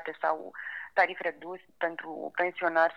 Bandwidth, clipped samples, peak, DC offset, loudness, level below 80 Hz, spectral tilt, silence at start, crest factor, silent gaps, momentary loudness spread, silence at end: 6.4 kHz; under 0.1%; -10 dBFS; under 0.1%; -31 LUFS; -80 dBFS; -5 dB/octave; 0 s; 22 dB; none; 12 LU; 0 s